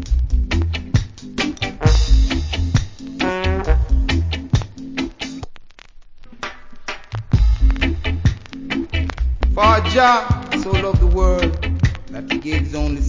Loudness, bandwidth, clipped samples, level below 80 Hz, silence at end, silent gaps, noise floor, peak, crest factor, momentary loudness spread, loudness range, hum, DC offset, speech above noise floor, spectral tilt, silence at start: -19 LUFS; 7.6 kHz; under 0.1%; -20 dBFS; 0 s; none; -39 dBFS; -2 dBFS; 16 dB; 15 LU; 7 LU; none; under 0.1%; 23 dB; -6 dB/octave; 0 s